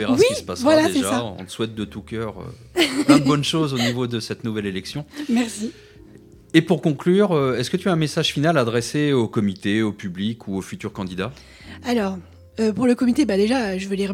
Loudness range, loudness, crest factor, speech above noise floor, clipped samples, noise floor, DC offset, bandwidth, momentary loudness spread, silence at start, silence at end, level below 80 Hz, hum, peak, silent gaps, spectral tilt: 5 LU; -21 LUFS; 20 dB; 25 dB; under 0.1%; -46 dBFS; under 0.1%; 16.5 kHz; 13 LU; 0 s; 0 s; -52 dBFS; none; -2 dBFS; none; -5.5 dB/octave